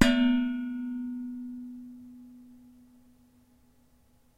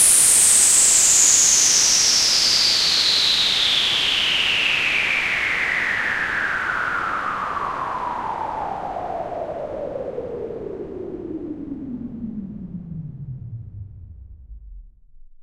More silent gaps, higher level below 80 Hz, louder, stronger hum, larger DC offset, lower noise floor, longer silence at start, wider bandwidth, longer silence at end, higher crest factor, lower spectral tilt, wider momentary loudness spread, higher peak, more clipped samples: neither; about the same, -50 dBFS vs -46 dBFS; second, -30 LUFS vs -15 LUFS; neither; second, under 0.1% vs 0.1%; first, -63 dBFS vs -44 dBFS; about the same, 0 s vs 0 s; second, 13.5 kHz vs 16 kHz; first, 1.85 s vs 0 s; first, 28 dB vs 20 dB; first, -5 dB/octave vs 0.5 dB/octave; first, 25 LU vs 21 LU; about the same, -4 dBFS vs -2 dBFS; neither